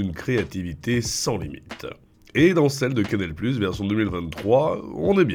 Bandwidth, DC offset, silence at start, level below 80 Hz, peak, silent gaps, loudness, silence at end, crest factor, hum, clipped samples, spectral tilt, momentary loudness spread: 19 kHz; under 0.1%; 0 s; -46 dBFS; -6 dBFS; none; -23 LUFS; 0 s; 18 dB; none; under 0.1%; -5.5 dB/octave; 12 LU